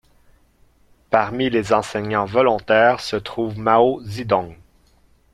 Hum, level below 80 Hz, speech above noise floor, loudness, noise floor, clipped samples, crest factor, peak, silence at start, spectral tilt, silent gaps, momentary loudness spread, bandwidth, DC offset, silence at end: none; -52 dBFS; 38 dB; -19 LUFS; -56 dBFS; under 0.1%; 20 dB; 0 dBFS; 1.1 s; -5.5 dB/octave; none; 9 LU; 14 kHz; under 0.1%; 0.8 s